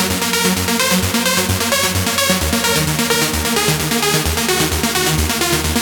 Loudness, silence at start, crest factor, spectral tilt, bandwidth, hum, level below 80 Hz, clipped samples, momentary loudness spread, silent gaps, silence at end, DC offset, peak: -15 LUFS; 0 s; 16 dB; -3 dB/octave; over 20 kHz; none; -30 dBFS; under 0.1%; 1 LU; none; 0 s; under 0.1%; 0 dBFS